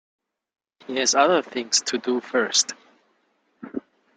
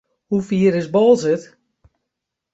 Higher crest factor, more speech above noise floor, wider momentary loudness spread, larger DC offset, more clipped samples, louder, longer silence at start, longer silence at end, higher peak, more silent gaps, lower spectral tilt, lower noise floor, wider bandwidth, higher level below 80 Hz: first, 22 dB vs 16 dB; second, 45 dB vs 65 dB; first, 17 LU vs 9 LU; neither; neither; second, -21 LUFS vs -17 LUFS; first, 0.9 s vs 0.3 s; second, 0.4 s vs 1.1 s; about the same, -4 dBFS vs -2 dBFS; neither; second, -1 dB/octave vs -7 dB/octave; second, -68 dBFS vs -81 dBFS; first, 11 kHz vs 8 kHz; second, -74 dBFS vs -58 dBFS